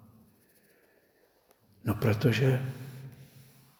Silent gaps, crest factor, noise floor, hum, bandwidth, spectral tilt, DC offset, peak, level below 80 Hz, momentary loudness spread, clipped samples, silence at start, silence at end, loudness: none; 22 dB; -67 dBFS; none; over 20 kHz; -7 dB/octave; under 0.1%; -10 dBFS; -64 dBFS; 21 LU; under 0.1%; 1.85 s; 0.55 s; -29 LUFS